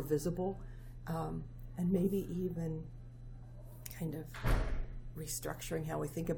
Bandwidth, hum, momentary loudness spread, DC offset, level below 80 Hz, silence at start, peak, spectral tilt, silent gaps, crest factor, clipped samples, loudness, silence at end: over 20 kHz; none; 17 LU; under 0.1%; -44 dBFS; 0 s; -20 dBFS; -6.5 dB/octave; none; 18 dB; under 0.1%; -39 LUFS; 0 s